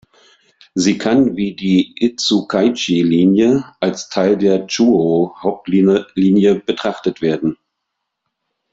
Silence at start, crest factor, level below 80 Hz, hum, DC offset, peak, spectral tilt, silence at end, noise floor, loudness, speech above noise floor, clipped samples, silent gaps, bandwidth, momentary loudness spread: 0.75 s; 14 dB; -54 dBFS; none; under 0.1%; -2 dBFS; -5.5 dB/octave; 1.2 s; -76 dBFS; -15 LUFS; 61 dB; under 0.1%; none; 8 kHz; 8 LU